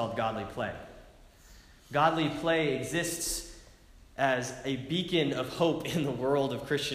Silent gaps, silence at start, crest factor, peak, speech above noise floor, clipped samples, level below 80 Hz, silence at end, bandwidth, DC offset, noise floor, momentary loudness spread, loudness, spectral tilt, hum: none; 0 s; 20 dB; -12 dBFS; 25 dB; under 0.1%; -56 dBFS; 0 s; 15.5 kHz; under 0.1%; -55 dBFS; 9 LU; -30 LUFS; -4.5 dB/octave; none